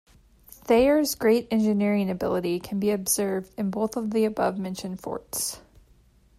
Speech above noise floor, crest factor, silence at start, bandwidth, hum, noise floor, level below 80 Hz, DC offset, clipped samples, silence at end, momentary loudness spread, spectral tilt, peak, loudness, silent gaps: 34 dB; 16 dB; 0.65 s; 16 kHz; none; -58 dBFS; -54 dBFS; under 0.1%; under 0.1%; 0.8 s; 11 LU; -5 dB/octave; -10 dBFS; -25 LUFS; none